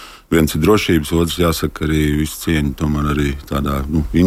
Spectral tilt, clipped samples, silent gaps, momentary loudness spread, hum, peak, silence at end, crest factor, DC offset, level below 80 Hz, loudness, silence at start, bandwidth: -6 dB/octave; under 0.1%; none; 6 LU; none; -2 dBFS; 0 s; 14 dB; under 0.1%; -26 dBFS; -17 LUFS; 0 s; 16.5 kHz